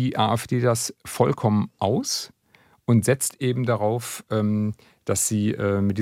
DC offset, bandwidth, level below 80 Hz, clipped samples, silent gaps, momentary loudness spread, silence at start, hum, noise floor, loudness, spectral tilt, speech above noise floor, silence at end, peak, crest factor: under 0.1%; 16.5 kHz; -62 dBFS; under 0.1%; none; 8 LU; 0 s; none; -59 dBFS; -23 LUFS; -5 dB/octave; 36 dB; 0 s; -4 dBFS; 18 dB